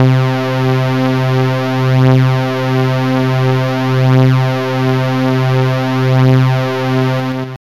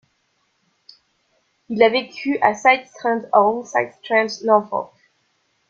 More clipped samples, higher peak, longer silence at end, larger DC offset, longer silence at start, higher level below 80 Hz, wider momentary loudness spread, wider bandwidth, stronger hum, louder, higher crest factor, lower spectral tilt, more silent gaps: neither; about the same, -2 dBFS vs 0 dBFS; second, 0.1 s vs 0.85 s; first, 1% vs under 0.1%; second, 0 s vs 1.7 s; first, -48 dBFS vs -68 dBFS; second, 5 LU vs 10 LU; about the same, 7.2 kHz vs 7.6 kHz; neither; first, -13 LUFS vs -19 LUFS; second, 10 dB vs 20 dB; first, -7.5 dB/octave vs -4 dB/octave; neither